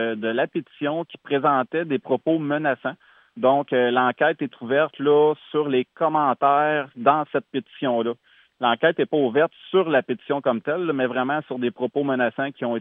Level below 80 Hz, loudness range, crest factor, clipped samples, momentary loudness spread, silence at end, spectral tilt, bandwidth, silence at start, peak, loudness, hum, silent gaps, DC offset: -82 dBFS; 3 LU; 18 dB; under 0.1%; 8 LU; 0 s; -9 dB/octave; 3.9 kHz; 0 s; -4 dBFS; -22 LUFS; none; none; under 0.1%